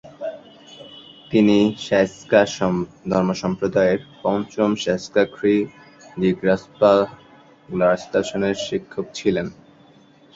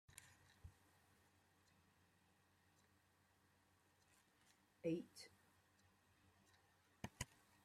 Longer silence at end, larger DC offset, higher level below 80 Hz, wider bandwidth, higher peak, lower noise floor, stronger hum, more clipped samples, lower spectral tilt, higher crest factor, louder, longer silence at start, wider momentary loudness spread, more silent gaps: first, 0.85 s vs 0.4 s; neither; first, -54 dBFS vs -78 dBFS; second, 7.8 kHz vs 16 kHz; first, -2 dBFS vs -30 dBFS; second, -51 dBFS vs -78 dBFS; neither; neither; about the same, -6 dB/octave vs -5 dB/octave; second, 18 dB vs 28 dB; first, -20 LUFS vs -52 LUFS; about the same, 0.05 s vs 0.1 s; second, 16 LU vs 20 LU; neither